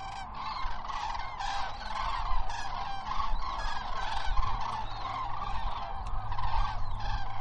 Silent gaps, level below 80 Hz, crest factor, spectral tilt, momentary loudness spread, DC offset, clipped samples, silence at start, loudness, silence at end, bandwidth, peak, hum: none; -36 dBFS; 18 dB; -4 dB/octave; 4 LU; under 0.1%; under 0.1%; 0 s; -36 LUFS; 0 s; 8 kHz; -12 dBFS; none